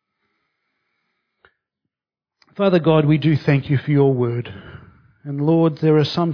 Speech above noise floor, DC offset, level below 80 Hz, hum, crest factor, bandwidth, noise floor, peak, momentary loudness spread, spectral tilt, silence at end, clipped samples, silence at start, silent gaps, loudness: 72 dB; under 0.1%; -58 dBFS; none; 16 dB; 5.4 kHz; -89 dBFS; -4 dBFS; 14 LU; -9 dB/octave; 0 s; under 0.1%; 2.6 s; none; -18 LUFS